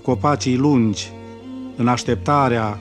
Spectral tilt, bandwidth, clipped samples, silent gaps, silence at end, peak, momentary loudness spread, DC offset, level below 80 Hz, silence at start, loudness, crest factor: -6 dB/octave; 10.5 kHz; under 0.1%; none; 0 s; -4 dBFS; 16 LU; under 0.1%; -50 dBFS; 0.05 s; -18 LUFS; 16 dB